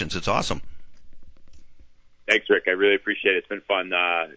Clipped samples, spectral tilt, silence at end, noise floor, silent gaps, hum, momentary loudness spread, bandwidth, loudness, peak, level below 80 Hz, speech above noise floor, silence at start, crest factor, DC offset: under 0.1%; -4 dB/octave; 0.05 s; -48 dBFS; none; none; 8 LU; 8 kHz; -22 LUFS; -6 dBFS; -48 dBFS; 25 dB; 0 s; 20 dB; under 0.1%